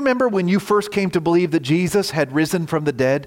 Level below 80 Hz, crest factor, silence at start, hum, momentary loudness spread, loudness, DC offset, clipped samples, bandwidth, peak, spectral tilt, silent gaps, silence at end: -54 dBFS; 12 dB; 0 s; none; 3 LU; -19 LUFS; under 0.1%; under 0.1%; 17 kHz; -6 dBFS; -6 dB/octave; none; 0 s